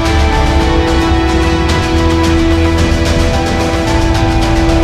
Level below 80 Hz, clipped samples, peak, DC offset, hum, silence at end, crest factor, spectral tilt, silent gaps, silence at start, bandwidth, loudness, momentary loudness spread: -14 dBFS; under 0.1%; 0 dBFS; under 0.1%; none; 0 s; 10 dB; -6 dB/octave; none; 0 s; 14 kHz; -12 LUFS; 2 LU